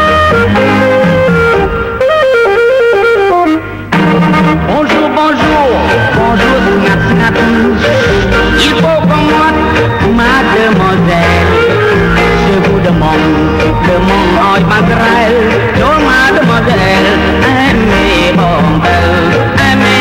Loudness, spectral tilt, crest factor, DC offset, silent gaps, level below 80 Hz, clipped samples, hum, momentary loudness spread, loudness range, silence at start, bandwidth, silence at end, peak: -8 LUFS; -6 dB/octave; 8 dB; under 0.1%; none; -22 dBFS; under 0.1%; none; 2 LU; 1 LU; 0 s; 16.5 kHz; 0 s; 0 dBFS